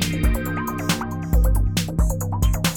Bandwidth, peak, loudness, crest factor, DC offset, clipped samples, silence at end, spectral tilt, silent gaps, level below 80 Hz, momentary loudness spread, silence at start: over 20 kHz; -6 dBFS; -23 LUFS; 14 dB; under 0.1%; under 0.1%; 0 s; -5 dB/octave; none; -22 dBFS; 4 LU; 0 s